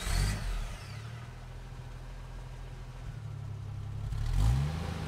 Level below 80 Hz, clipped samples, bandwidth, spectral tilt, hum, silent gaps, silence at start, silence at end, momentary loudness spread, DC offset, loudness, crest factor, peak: -38 dBFS; under 0.1%; 15 kHz; -5 dB/octave; none; none; 0 s; 0 s; 16 LU; under 0.1%; -38 LUFS; 18 dB; -18 dBFS